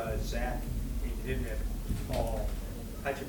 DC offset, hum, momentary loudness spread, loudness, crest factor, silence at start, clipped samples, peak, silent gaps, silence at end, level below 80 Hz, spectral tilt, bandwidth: under 0.1%; none; 4 LU; -36 LUFS; 16 dB; 0 s; under 0.1%; -18 dBFS; none; 0 s; -36 dBFS; -6 dB/octave; 19 kHz